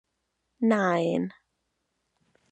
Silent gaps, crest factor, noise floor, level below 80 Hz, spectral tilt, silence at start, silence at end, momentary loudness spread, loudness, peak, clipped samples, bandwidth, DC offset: none; 20 dB; -79 dBFS; -78 dBFS; -7 dB/octave; 0.6 s; 1.2 s; 8 LU; -26 LUFS; -10 dBFS; under 0.1%; 8.8 kHz; under 0.1%